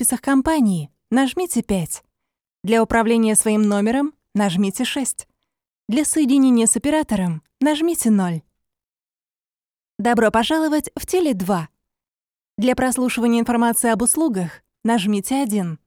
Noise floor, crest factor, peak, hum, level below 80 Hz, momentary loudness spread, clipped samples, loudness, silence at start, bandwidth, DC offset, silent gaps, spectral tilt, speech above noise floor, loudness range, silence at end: under -90 dBFS; 16 dB; -4 dBFS; none; -48 dBFS; 9 LU; under 0.1%; -19 LUFS; 0 s; 18 kHz; under 0.1%; 12.50-12.54 s; -4.5 dB/octave; over 72 dB; 3 LU; 0.1 s